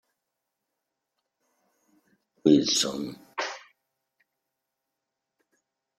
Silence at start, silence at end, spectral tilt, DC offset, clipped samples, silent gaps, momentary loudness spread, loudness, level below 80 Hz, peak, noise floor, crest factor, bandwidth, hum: 2.45 s; 2.4 s; -3.5 dB/octave; under 0.1%; under 0.1%; none; 15 LU; -25 LUFS; -70 dBFS; -8 dBFS; -85 dBFS; 24 dB; 14.5 kHz; none